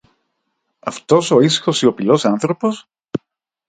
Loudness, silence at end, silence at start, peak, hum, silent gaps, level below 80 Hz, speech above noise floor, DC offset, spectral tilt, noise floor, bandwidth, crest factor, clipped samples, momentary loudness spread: -15 LUFS; 0.5 s; 0.85 s; 0 dBFS; none; none; -60 dBFS; 57 dB; under 0.1%; -5 dB/octave; -72 dBFS; 9.4 kHz; 18 dB; under 0.1%; 15 LU